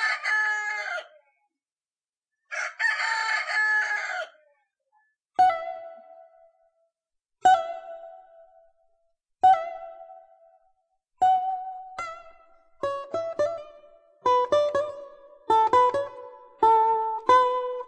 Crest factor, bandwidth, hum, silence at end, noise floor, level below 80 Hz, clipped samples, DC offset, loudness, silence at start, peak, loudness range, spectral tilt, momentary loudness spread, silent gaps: 20 dB; 10 kHz; none; 0 s; under -90 dBFS; -68 dBFS; under 0.1%; under 0.1%; -24 LUFS; 0 s; -8 dBFS; 7 LU; -2.5 dB/octave; 18 LU; 1.72-1.76 s, 2.09-2.13 s